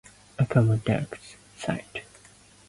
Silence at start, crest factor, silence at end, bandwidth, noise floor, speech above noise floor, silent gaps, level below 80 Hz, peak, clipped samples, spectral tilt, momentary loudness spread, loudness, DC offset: 0.4 s; 18 dB; 0.7 s; 11.5 kHz; -54 dBFS; 29 dB; none; -54 dBFS; -10 dBFS; under 0.1%; -7 dB/octave; 21 LU; -27 LUFS; under 0.1%